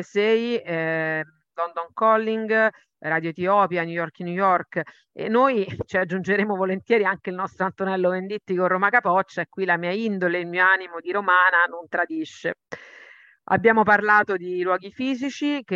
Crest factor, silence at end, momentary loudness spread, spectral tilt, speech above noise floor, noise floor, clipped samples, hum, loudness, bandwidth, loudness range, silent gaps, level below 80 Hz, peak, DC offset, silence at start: 18 dB; 0 s; 11 LU; -6.5 dB/octave; 27 dB; -50 dBFS; under 0.1%; none; -22 LUFS; 7.6 kHz; 3 LU; none; -66 dBFS; -4 dBFS; under 0.1%; 0 s